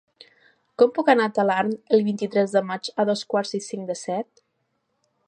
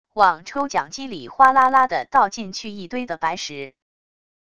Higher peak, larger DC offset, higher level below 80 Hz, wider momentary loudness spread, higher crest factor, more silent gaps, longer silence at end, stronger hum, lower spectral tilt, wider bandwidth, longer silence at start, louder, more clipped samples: second, -4 dBFS vs 0 dBFS; second, under 0.1% vs 0.5%; second, -78 dBFS vs -58 dBFS; second, 11 LU vs 16 LU; about the same, 20 dB vs 20 dB; neither; first, 1.05 s vs 0.8 s; neither; first, -5 dB/octave vs -3 dB/octave; about the same, 10.5 kHz vs 11 kHz; first, 0.8 s vs 0.15 s; second, -23 LUFS vs -19 LUFS; neither